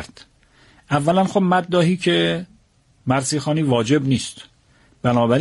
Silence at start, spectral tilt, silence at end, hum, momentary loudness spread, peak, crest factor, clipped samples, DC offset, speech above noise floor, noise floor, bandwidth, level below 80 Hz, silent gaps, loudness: 0 s; -5.5 dB/octave; 0 s; none; 11 LU; -4 dBFS; 16 dB; under 0.1%; under 0.1%; 39 dB; -57 dBFS; 11.5 kHz; -54 dBFS; none; -19 LUFS